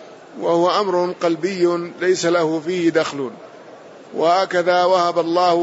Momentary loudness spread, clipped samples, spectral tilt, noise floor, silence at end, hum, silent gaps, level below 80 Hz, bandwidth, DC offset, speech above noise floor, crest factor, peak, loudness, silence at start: 9 LU; under 0.1%; -4.5 dB/octave; -40 dBFS; 0 s; none; none; -72 dBFS; 8 kHz; under 0.1%; 23 dB; 14 dB; -4 dBFS; -18 LUFS; 0 s